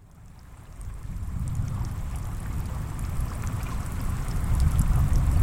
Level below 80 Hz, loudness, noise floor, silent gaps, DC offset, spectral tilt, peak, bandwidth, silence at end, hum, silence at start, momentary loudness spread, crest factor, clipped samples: -30 dBFS; -30 LUFS; -47 dBFS; none; under 0.1%; -6.5 dB/octave; -10 dBFS; 16.5 kHz; 0 s; none; 0 s; 18 LU; 16 dB; under 0.1%